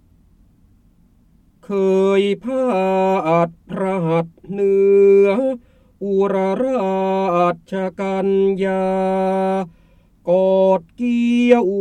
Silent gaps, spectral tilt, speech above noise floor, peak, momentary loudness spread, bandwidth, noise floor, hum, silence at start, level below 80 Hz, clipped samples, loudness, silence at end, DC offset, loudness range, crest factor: none; -8 dB/octave; 37 dB; -2 dBFS; 10 LU; 9 kHz; -54 dBFS; none; 1.7 s; -54 dBFS; under 0.1%; -17 LUFS; 0 s; under 0.1%; 3 LU; 16 dB